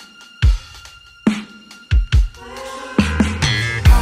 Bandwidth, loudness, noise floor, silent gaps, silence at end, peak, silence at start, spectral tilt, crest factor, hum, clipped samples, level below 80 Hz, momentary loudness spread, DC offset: 15 kHz; -19 LUFS; -41 dBFS; none; 0 s; 0 dBFS; 0 s; -5.5 dB/octave; 16 dB; none; under 0.1%; -20 dBFS; 21 LU; under 0.1%